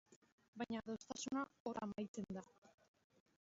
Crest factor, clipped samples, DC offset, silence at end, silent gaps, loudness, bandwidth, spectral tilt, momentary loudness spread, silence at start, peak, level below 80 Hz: 18 dB; under 0.1%; under 0.1%; 0.7 s; 0.16-0.22 s, 0.32-0.38 s, 0.48-0.53 s, 1.60-1.65 s, 2.08-2.14 s, 2.58-2.62 s; -48 LUFS; 7.6 kHz; -5 dB/octave; 8 LU; 0.1 s; -30 dBFS; -78 dBFS